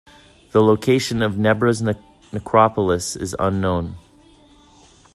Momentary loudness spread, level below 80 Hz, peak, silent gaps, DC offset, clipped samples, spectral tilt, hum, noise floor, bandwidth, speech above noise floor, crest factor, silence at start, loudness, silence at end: 12 LU; -50 dBFS; 0 dBFS; none; under 0.1%; under 0.1%; -5.5 dB/octave; none; -51 dBFS; 13.5 kHz; 32 dB; 20 dB; 0.55 s; -19 LUFS; 1.15 s